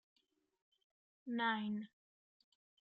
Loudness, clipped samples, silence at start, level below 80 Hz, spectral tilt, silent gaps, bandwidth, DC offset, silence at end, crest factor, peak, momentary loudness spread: -40 LUFS; under 0.1%; 1.25 s; under -90 dBFS; -2.5 dB/octave; none; 5 kHz; under 0.1%; 1 s; 18 dB; -28 dBFS; 19 LU